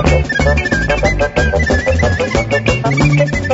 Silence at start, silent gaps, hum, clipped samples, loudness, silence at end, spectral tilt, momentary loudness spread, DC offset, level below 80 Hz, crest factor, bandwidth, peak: 0 s; none; none; under 0.1%; -13 LUFS; 0 s; -6 dB/octave; 2 LU; under 0.1%; -20 dBFS; 12 dB; 8 kHz; 0 dBFS